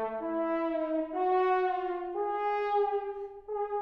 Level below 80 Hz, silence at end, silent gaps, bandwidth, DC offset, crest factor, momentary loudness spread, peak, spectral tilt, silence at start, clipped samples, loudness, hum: -64 dBFS; 0 s; none; 5.6 kHz; under 0.1%; 12 dB; 8 LU; -18 dBFS; -6.5 dB/octave; 0 s; under 0.1%; -31 LUFS; none